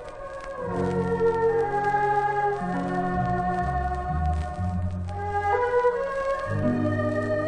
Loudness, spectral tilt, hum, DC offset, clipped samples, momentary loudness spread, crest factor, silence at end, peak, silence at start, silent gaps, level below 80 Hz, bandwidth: -26 LUFS; -8 dB/octave; none; under 0.1%; under 0.1%; 7 LU; 14 dB; 0 s; -12 dBFS; 0 s; none; -38 dBFS; 10 kHz